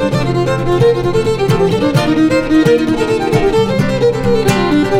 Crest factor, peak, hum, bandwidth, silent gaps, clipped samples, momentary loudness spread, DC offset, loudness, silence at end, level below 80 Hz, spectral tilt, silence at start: 12 dB; 0 dBFS; none; 16 kHz; none; under 0.1%; 3 LU; under 0.1%; -13 LUFS; 0 s; -30 dBFS; -6.5 dB/octave; 0 s